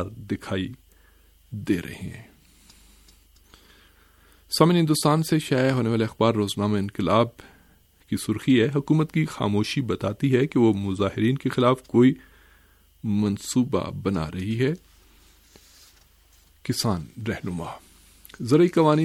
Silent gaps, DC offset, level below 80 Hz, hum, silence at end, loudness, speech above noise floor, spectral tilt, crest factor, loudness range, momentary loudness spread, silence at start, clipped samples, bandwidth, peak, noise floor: none; under 0.1%; -54 dBFS; none; 0 s; -23 LUFS; 35 dB; -6 dB/octave; 20 dB; 10 LU; 15 LU; 0 s; under 0.1%; 16 kHz; -4 dBFS; -58 dBFS